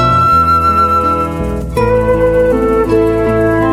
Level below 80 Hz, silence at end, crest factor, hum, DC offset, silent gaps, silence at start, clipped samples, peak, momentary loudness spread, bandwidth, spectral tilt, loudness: -24 dBFS; 0 s; 10 dB; none; under 0.1%; none; 0 s; under 0.1%; 0 dBFS; 7 LU; 15 kHz; -7.5 dB/octave; -11 LUFS